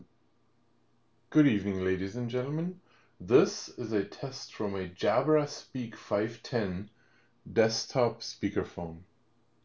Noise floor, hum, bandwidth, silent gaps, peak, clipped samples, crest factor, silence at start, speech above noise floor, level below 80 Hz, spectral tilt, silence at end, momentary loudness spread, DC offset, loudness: -71 dBFS; none; 7.6 kHz; none; -10 dBFS; under 0.1%; 20 dB; 0 s; 41 dB; -58 dBFS; -6 dB/octave; 0.6 s; 13 LU; under 0.1%; -31 LUFS